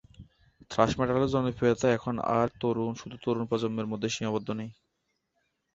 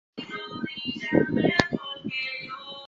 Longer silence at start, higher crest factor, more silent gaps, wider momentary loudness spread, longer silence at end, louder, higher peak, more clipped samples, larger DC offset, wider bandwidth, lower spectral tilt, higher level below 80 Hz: about the same, 0.2 s vs 0.15 s; about the same, 24 dB vs 28 dB; neither; second, 9 LU vs 13 LU; first, 1.05 s vs 0 s; about the same, -29 LUFS vs -27 LUFS; second, -6 dBFS vs -2 dBFS; neither; neither; about the same, 8 kHz vs 7.8 kHz; about the same, -6 dB/octave vs -5.5 dB/octave; about the same, -56 dBFS vs -54 dBFS